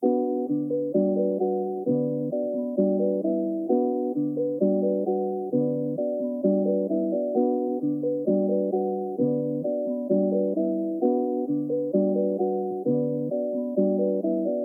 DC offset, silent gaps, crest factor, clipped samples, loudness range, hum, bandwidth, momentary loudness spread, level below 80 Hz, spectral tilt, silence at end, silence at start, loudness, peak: under 0.1%; none; 14 dB; under 0.1%; 1 LU; none; 1.4 kHz; 4 LU; -88 dBFS; -14 dB/octave; 0 s; 0 s; -25 LUFS; -10 dBFS